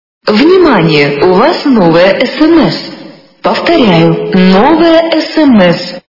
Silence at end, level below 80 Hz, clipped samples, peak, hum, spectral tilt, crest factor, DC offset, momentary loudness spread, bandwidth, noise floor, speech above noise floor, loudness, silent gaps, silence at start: 0.15 s; -40 dBFS; 2%; 0 dBFS; none; -7 dB/octave; 6 dB; under 0.1%; 7 LU; 6 kHz; -30 dBFS; 24 dB; -7 LUFS; none; 0.25 s